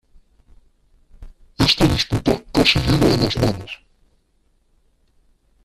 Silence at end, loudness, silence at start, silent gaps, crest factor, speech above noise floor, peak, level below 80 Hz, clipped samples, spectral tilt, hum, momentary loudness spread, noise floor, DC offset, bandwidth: 1.9 s; -17 LUFS; 1.2 s; none; 20 dB; 44 dB; 0 dBFS; -36 dBFS; under 0.1%; -5 dB/octave; none; 12 LU; -62 dBFS; under 0.1%; 14.5 kHz